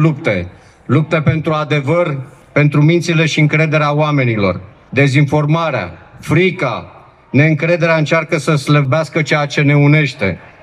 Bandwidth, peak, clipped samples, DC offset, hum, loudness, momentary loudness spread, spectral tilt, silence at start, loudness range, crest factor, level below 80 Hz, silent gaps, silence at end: 10.5 kHz; 0 dBFS; under 0.1%; under 0.1%; none; -14 LUFS; 8 LU; -7 dB/octave; 0 s; 2 LU; 14 dB; -50 dBFS; none; 0.15 s